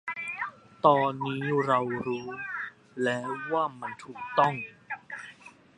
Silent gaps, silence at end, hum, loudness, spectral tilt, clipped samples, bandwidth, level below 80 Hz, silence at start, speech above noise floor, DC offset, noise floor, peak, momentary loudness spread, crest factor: none; 0.3 s; none; -29 LUFS; -6.5 dB/octave; under 0.1%; 11 kHz; -72 dBFS; 0.05 s; 24 dB; under 0.1%; -52 dBFS; -6 dBFS; 15 LU; 24 dB